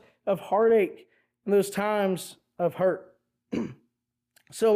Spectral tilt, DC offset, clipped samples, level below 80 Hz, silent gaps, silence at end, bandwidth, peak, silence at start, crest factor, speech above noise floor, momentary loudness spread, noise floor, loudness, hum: -5.5 dB/octave; under 0.1%; under 0.1%; -70 dBFS; none; 0 s; 15.5 kHz; -14 dBFS; 0.25 s; 14 dB; 56 dB; 15 LU; -81 dBFS; -27 LUFS; none